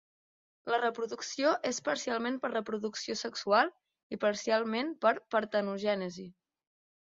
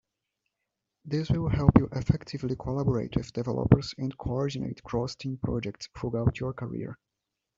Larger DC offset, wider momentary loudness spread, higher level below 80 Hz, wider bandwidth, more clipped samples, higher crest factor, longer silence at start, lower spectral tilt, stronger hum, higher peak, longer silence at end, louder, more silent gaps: neither; second, 8 LU vs 12 LU; second, -78 dBFS vs -44 dBFS; about the same, 7.8 kHz vs 7.6 kHz; neither; second, 20 dB vs 26 dB; second, 0.65 s vs 1.05 s; second, -3.5 dB/octave vs -8 dB/octave; neither; second, -12 dBFS vs -4 dBFS; first, 0.8 s vs 0.65 s; second, -32 LUFS vs -29 LUFS; first, 4.03-4.10 s vs none